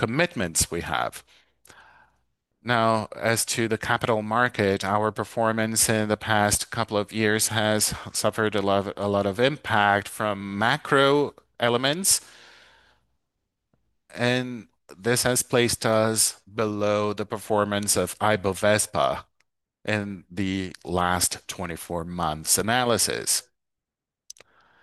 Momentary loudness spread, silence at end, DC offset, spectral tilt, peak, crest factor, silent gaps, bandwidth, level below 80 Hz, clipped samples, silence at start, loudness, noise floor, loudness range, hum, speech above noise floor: 9 LU; 1.4 s; under 0.1%; -3 dB/octave; -4 dBFS; 20 dB; none; 13 kHz; -56 dBFS; under 0.1%; 0 s; -24 LUFS; -88 dBFS; 4 LU; none; 64 dB